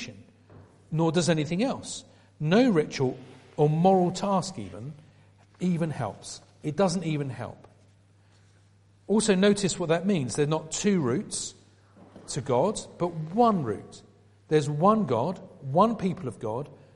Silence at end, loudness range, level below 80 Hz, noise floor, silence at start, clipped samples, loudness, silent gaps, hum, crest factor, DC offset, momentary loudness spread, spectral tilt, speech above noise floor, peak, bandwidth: 0.2 s; 6 LU; -60 dBFS; -59 dBFS; 0 s; under 0.1%; -26 LUFS; none; none; 20 dB; under 0.1%; 16 LU; -5.5 dB/octave; 34 dB; -6 dBFS; 11.5 kHz